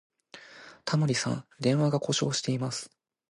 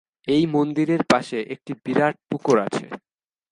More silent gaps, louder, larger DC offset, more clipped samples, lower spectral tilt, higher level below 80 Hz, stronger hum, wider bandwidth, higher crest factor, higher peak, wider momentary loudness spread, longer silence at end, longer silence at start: neither; second, -29 LUFS vs -22 LUFS; neither; neither; about the same, -5 dB/octave vs -6 dB/octave; second, -70 dBFS vs -62 dBFS; neither; about the same, 11.5 kHz vs 11.5 kHz; about the same, 18 dB vs 22 dB; second, -12 dBFS vs 0 dBFS; first, 21 LU vs 12 LU; about the same, 0.45 s vs 0.55 s; about the same, 0.35 s vs 0.25 s